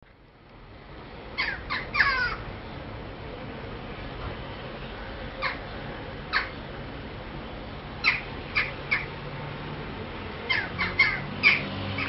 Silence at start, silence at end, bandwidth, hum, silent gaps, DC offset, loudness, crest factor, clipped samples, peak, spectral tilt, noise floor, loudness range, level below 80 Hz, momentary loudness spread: 0.05 s; 0 s; 5.8 kHz; none; none; under 0.1%; -29 LUFS; 24 dB; under 0.1%; -6 dBFS; -2 dB/octave; -53 dBFS; 10 LU; -46 dBFS; 16 LU